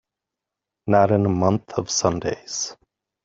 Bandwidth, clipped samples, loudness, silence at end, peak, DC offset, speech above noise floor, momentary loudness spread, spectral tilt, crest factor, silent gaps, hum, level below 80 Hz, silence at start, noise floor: 8 kHz; under 0.1%; -21 LUFS; 0.5 s; -4 dBFS; under 0.1%; 65 dB; 10 LU; -5 dB/octave; 20 dB; none; none; -56 dBFS; 0.85 s; -86 dBFS